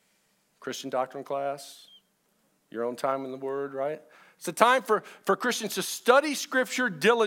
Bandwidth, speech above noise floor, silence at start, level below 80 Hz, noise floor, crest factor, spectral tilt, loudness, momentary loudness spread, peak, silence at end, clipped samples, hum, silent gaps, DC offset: 17.5 kHz; 43 dB; 0.6 s; -88 dBFS; -70 dBFS; 24 dB; -3 dB/octave; -27 LUFS; 16 LU; -4 dBFS; 0 s; under 0.1%; none; none; under 0.1%